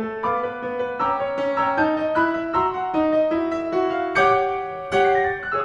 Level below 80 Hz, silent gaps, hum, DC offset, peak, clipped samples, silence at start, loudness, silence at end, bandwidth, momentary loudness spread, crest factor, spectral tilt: -52 dBFS; none; none; under 0.1%; -6 dBFS; under 0.1%; 0 s; -21 LUFS; 0 s; 10.5 kHz; 6 LU; 16 dB; -6 dB/octave